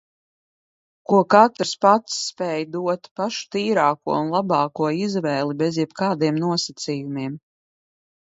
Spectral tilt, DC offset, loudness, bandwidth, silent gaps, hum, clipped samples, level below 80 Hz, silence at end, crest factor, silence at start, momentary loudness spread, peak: -5 dB/octave; under 0.1%; -21 LUFS; 8 kHz; 3.11-3.16 s; none; under 0.1%; -70 dBFS; 0.9 s; 22 dB; 1.1 s; 11 LU; 0 dBFS